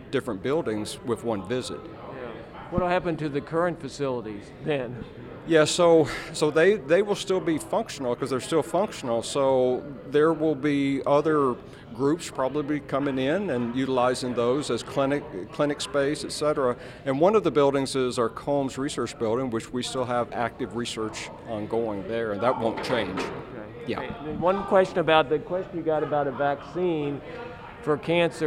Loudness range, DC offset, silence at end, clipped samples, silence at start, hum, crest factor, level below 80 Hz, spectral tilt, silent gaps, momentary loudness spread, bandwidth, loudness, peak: 6 LU; under 0.1%; 0 s; under 0.1%; 0 s; none; 20 dB; -54 dBFS; -5 dB/octave; none; 12 LU; 15.5 kHz; -26 LUFS; -4 dBFS